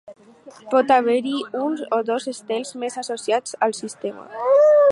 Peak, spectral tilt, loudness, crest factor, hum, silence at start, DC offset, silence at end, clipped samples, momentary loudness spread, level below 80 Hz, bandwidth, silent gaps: -4 dBFS; -3.5 dB/octave; -21 LUFS; 16 dB; none; 0.1 s; under 0.1%; 0 s; under 0.1%; 13 LU; -76 dBFS; 11.5 kHz; none